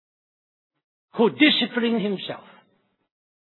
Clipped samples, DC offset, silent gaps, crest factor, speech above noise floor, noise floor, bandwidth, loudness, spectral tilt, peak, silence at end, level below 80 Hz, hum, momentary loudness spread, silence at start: under 0.1%; under 0.1%; none; 22 dB; 46 dB; -67 dBFS; 4.3 kHz; -21 LUFS; -7.5 dB/octave; -4 dBFS; 1.15 s; -84 dBFS; none; 18 LU; 1.15 s